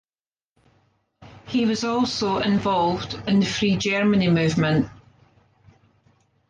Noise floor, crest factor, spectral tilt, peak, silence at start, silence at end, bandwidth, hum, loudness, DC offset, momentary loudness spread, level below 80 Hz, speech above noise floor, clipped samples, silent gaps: under -90 dBFS; 14 dB; -5.5 dB/octave; -8 dBFS; 1.2 s; 1.55 s; 9.2 kHz; none; -22 LUFS; under 0.1%; 5 LU; -52 dBFS; over 69 dB; under 0.1%; none